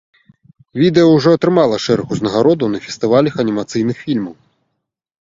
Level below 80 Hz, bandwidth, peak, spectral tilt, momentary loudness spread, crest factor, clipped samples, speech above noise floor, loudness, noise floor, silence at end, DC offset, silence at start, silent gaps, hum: -52 dBFS; 7.8 kHz; 0 dBFS; -6.5 dB/octave; 10 LU; 16 dB; under 0.1%; 60 dB; -14 LUFS; -74 dBFS; 0.9 s; under 0.1%; 0.75 s; none; none